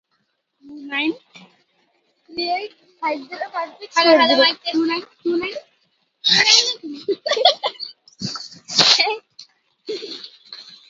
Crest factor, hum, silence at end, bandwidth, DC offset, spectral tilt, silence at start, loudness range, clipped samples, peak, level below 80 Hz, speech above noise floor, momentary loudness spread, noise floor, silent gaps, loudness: 22 dB; none; 0.15 s; 7.8 kHz; under 0.1%; -1.5 dB/octave; 0.65 s; 11 LU; under 0.1%; 0 dBFS; -70 dBFS; 51 dB; 21 LU; -70 dBFS; none; -18 LUFS